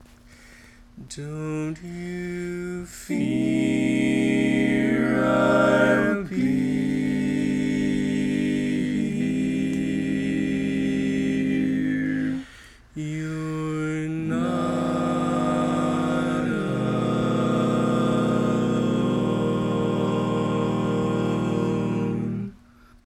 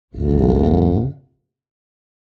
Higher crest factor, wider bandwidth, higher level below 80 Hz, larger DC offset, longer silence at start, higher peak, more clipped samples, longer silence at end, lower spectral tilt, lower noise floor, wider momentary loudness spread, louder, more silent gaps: about the same, 16 dB vs 16 dB; first, 12.5 kHz vs 6 kHz; second, -50 dBFS vs -28 dBFS; neither; first, 0.45 s vs 0.15 s; second, -6 dBFS vs -2 dBFS; neither; second, 0.5 s vs 1.1 s; second, -7 dB/octave vs -11 dB/octave; second, -52 dBFS vs -58 dBFS; about the same, 9 LU vs 7 LU; second, -24 LUFS vs -17 LUFS; neither